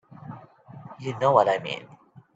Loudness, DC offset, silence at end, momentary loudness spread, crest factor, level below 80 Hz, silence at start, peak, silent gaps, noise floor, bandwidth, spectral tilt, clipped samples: -24 LUFS; under 0.1%; 0.5 s; 25 LU; 24 dB; -68 dBFS; 0.25 s; -4 dBFS; none; -46 dBFS; 8 kHz; -6 dB/octave; under 0.1%